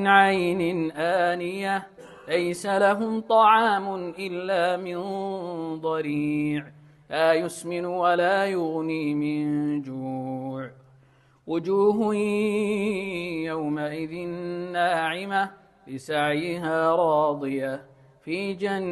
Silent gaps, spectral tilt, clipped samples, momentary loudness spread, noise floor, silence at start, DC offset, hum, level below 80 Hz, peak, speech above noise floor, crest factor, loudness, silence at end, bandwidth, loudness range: none; -5.5 dB/octave; under 0.1%; 11 LU; -58 dBFS; 0 s; under 0.1%; none; -66 dBFS; -4 dBFS; 34 dB; 22 dB; -25 LUFS; 0 s; 12.5 kHz; 5 LU